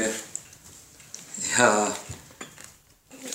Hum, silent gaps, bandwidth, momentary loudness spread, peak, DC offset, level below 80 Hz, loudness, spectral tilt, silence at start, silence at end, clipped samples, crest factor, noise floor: none; none; 16 kHz; 26 LU; -2 dBFS; under 0.1%; -62 dBFS; -24 LUFS; -2 dB/octave; 0 s; 0 s; under 0.1%; 26 dB; -53 dBFS